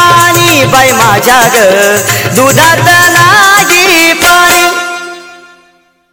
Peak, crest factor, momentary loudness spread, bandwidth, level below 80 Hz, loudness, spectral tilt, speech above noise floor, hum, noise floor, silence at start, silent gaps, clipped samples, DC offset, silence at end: 0 dBFS; 6 dB; 6 LU; over 20 kHz; -38 dBFS; -4 LUFS; -2.5 dB/octave; 42 dB; none; -47 dBFS; 0 s; none; 3%; under 0.1%; 0.75 s